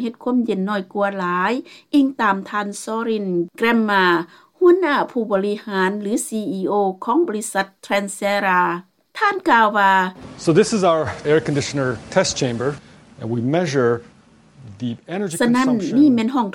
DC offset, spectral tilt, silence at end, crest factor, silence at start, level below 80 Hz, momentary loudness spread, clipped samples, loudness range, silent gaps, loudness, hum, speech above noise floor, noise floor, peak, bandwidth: under 0.1%; -5 dB/octave; 0 s; 18 dB; 0 s; -58 dBFS; 10 LU; under 0.1%; 4 LU; none; -19 LUFS; none; 30 dB; -48 dBFS; 0 dBFS; 16.5 kHz